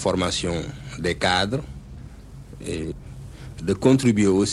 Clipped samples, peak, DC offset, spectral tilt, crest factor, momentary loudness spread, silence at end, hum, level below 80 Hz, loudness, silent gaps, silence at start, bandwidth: under 0.1%; -4 dBFS; under 0.1%; -5 dB/octave; 20 dB; 23 LU; 0 s; none; -42 dBFS; -23 LUFS; none; 0 s; 12.5 kHz